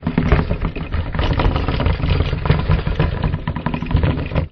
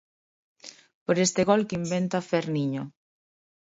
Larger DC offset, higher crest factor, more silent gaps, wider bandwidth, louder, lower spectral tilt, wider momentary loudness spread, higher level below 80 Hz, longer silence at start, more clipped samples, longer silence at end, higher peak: neither; second, 16 dB vs 22 dB; second, none vs 0.94-1.06 s; second, 6 kHz vs 8 kHz; first, -20 LUFS vs -26 LUFS; first, -9 dB/octave vs -5 dB/octave; second, 6 LU vs 23 LU; first, -22 dBFS vs -66 dBFS; second, 0 s vs 0.65 s; neither; second, 0.05 s vs 0.9 s; first, -2 dBFS vs -8 dBFS